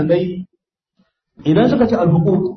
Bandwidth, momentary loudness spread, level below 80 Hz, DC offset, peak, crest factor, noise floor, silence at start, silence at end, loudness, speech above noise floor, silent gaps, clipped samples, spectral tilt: 6.2 kHz; 11 LU; -46 dBFS; under 0.1%; -2 dBFS; 14 dB; -64 dBFS; 0 s; 0 s; -15 LUFS; 49 dB; none; under 0.1%; -9.5 dB/octave